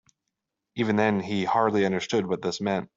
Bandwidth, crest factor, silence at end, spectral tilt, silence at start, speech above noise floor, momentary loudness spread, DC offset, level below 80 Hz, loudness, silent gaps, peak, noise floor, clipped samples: 7.8 kHz; 18 dB; 0.1 s; -5.5 dB/octave; 0.75 s; 58 dB; 6 LU; under 0.1%; -66 dBFS; -25 LUFS; none; -8 dBFS; -83 dBFS; under 0.1%